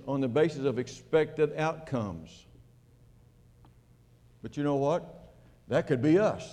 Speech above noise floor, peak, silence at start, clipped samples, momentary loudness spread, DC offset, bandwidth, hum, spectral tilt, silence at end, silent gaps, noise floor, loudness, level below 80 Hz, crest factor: 31 dB; -14 dBFS; 0 s; under 0.1%; 16 LU; under 0.1%; 10 kHz; none; -7 dB/octave; 0 s; none; -60 dBFS; -29 LUFS; -62 dBFS; 18 dB